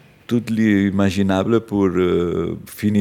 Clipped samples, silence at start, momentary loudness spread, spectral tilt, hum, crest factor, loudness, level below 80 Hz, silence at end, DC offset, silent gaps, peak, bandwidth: under 0.1%; 0.3 s; 7 LU; -7 dB/octave; none; 14 dB; -19 LUFS; -52 dBFS; 0 s; under 0.1%; none; -4 dBFS; 17 kHz